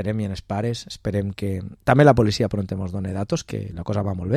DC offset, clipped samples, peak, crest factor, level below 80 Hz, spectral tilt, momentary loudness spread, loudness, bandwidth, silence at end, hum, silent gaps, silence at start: under 0.1%; under 0.1%; -2 dBFS; 20 dB; -44 dBFS; -7 dB/octave; 13 LU; -23 LUFS; 14 kHz; 0 s; none; none; 0 s